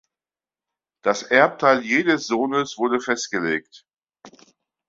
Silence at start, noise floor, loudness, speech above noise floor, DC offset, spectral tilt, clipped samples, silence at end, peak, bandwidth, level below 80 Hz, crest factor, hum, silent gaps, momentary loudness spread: 1.05 s; under -90 dBFS; -20 LUFS; over 69 dB; under 0.1%; -4 dB/octave; under 0.1%; 0.6 s; -2 dBFS; 7.8 kHz; -68 dBFS; 20 dB; none; none; 7 LU